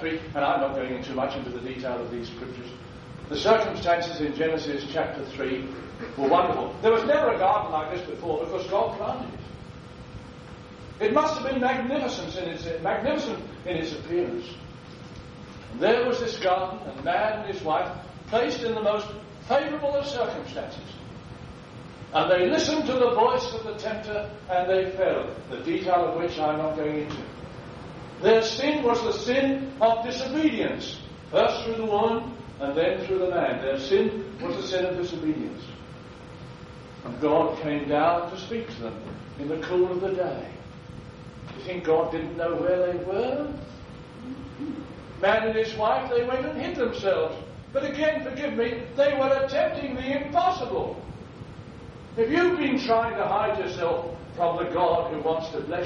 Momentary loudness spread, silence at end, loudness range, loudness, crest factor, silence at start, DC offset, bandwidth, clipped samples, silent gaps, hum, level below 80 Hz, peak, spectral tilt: 19 LU; 0 s; 4 LU; -26 LUFS; 20 dB; 0 s; under 0.1%; 7.8 kHz; under 0.1%; none; none; -52 dBFS; -6 dBFS; -5.5 dB/octave